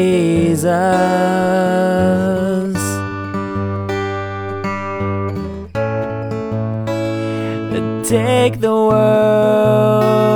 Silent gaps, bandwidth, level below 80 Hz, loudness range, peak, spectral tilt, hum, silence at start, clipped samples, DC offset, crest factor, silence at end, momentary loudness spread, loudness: none; over 20 kHz; -44 dBFS; 7 LU; 0 dBFS; -6.5 dB/octave; none; 0 s; under 0.1%; under 0.1%; 14 dB; 0 s; 10 LU; -16 LUFS